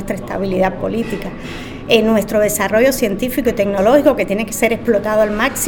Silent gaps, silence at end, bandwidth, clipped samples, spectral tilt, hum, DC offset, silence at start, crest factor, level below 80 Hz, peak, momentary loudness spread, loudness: none; 0 s; 19.5 kHz; under 0.1%; -4.5 dB/octave; none; under 0.1%; 0 s; 16 dB; -36 dBFS; 0 dBFS; 11 LU; -15 LUFS